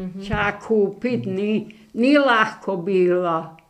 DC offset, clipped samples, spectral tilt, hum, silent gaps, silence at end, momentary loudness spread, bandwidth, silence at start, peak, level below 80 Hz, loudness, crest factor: under 0.1%; under 0.1%; -6.5 dB/octave; none; none; 0.15 s; 10 LU; 9.6 kHz; 0 s; -4 dBFS; -48 dBFS; -20 LUFS; 16 dB